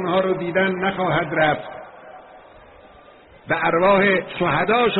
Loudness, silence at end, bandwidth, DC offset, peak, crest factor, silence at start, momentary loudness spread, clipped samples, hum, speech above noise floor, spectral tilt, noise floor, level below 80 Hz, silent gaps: -19 LUFS; 0 s; 4.1 kHz; under 0.1%; -6 dBFS; 16 dB; 0 s; 11 LU; under 0.1%; none; 28 dB; -3.5 dB/octave; -47 dBFS; -52 dBFS; none